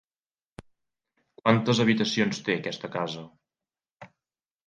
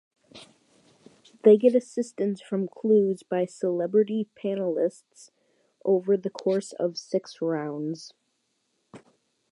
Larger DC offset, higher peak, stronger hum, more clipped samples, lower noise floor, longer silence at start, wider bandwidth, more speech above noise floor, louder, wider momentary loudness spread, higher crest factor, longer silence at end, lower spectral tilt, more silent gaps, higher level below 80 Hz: neither; about the same, -6 dBFS vs -6 dBFS; neither; neither; first, under -90 dBFS vs -74 dBFS; first, 1.45 s vs 0.35 s; second, 9.2 kHz vs 11 kHz; first, over 65 dB vs 50 dB; about the same, -26 LUFS vs -26 LUFS; about the same, 10 LU vs 12 LU; about the same, 24 dB vs 20 dB; about the same, 0.6 s vs 0.55 s; second, -5.5 dB/octave vs -7 dB/octave; neither; first, -68 dBFS vs -82 dBFS